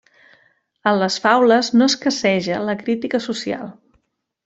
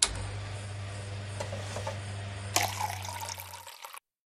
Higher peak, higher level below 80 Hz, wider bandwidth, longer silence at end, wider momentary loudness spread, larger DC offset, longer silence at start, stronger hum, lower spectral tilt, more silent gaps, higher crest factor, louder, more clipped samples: about the same, -2 dBFS vs -4 dBFS; second, -62 dBFS vs -52 dBFS; second, 8 kHz vs 16 kHz; first, 0.75 s vs 0.3 s; second, 11 LU vs 14 LU; neither; first, 0.85 s vs 0 s; neither; first, -4 dB/octave vs -2.5 dB/octave; neither; second, 18 dB vs 32 dB; first, -18 LUFS vs -35 LUFS; neither